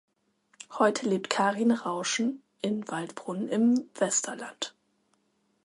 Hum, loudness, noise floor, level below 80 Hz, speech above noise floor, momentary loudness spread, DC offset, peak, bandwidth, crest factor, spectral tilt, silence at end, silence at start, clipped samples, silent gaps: none; -29 LUFS; -72 dBFS; -78 dBFS; 45 dB; 11 LU; under 0.1%; -8 dBFS; 11.5 kHz; 22 dB; -3.5 dB/octave; 0.95 s; 0.6 s; under 0.1%; none